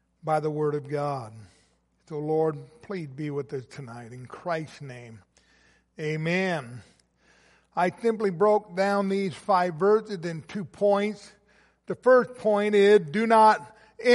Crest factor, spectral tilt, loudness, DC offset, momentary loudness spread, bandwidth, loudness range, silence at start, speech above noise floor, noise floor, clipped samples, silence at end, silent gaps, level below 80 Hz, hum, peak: 18 dB; -6.5 dB/octave; -25 LUFS; under 0.1%; 20 LU; 11.5 kHz; 11 LU; 0.25 s; 41 dB; -66 dBFS; under 0.1%; 0 s; none; -70 dBFS; none; -8 dBFS